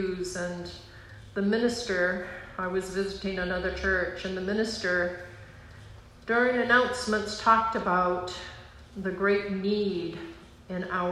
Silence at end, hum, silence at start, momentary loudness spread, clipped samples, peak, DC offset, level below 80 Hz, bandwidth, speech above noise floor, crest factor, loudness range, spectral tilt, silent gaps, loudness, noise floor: 0 s; none; 0 s; 21 LU; under 0.1%; -8 dBFS; under 0.1%; -50 dBFS; 12.5 kHz; 20 dB; 22 dB; 4 LU; -5 dB/octave; none; -28 LUFS; -48 dBFS